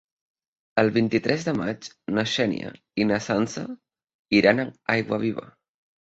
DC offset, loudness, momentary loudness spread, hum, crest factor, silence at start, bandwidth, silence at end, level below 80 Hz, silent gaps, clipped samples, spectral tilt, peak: under 0.1%; -24 LUFS; 13 LU; none; 22 dB; 0.75 s; 8 kHz; 0.65 s; -60 dBFS; 4.14-4.25 s; under 0.1%; -5.5 dB/octave; -4 dBFS